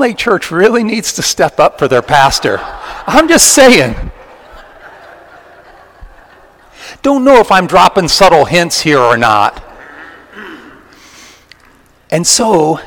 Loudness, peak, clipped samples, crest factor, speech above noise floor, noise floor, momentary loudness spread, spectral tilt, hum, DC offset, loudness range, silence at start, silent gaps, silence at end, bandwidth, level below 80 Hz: -8 LUFS; 0 dBFS; 3%; 12 dB; 36 dB; -45 dBFS; 15 LU; -3 dB/octave; none; under 0.1%; 8 LU; 0 s; none; 0 s; over 20 kHz; -36 dBFS